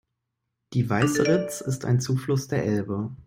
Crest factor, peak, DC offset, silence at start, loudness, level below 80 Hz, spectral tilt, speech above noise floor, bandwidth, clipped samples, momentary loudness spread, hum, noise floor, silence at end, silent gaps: 18 dB; -8 dBFS; under 0.1%; 0.7 s; -25 LUFS; -58 dBFS; -6 dB/octave; 57 dB; 16 kHz; under 0.1%; 8 LU; none; -81 dBFS; 0.05 s; none